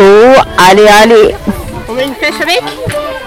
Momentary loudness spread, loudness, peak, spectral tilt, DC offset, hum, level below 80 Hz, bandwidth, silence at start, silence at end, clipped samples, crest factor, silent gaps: 15 LU; -6 LUFS; 0 dBFS; -4 dB/octave; under 0.1%; none; -30 dBFS; 17 kHz; 0 s; 0 s; 2%; 6 dB; none